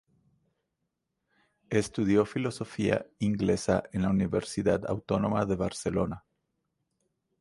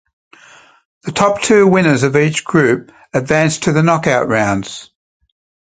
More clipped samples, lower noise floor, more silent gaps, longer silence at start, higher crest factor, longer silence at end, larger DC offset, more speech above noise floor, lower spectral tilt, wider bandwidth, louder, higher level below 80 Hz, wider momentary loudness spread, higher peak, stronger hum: neither; first, -82 dBFS vs -44 dBFS; neither; first, 1.7 s vs 1.05 s; first, 20 dB vs 14 dB; first, 1.25 s vs 0.75 s; neither; first, 54 dB vs 31 dB; about the same, -6.5 dB/octave vs -5.5 dB/octave; first, 11.5 kHz vs 9.6 kHz; second, -29 LUFS vs -13 LUFS; about the same, -52 dBFS vs -48 dBFS; second, 5 LU vs 11 LU; second, -10 dBFS vs 0 dBFS; neither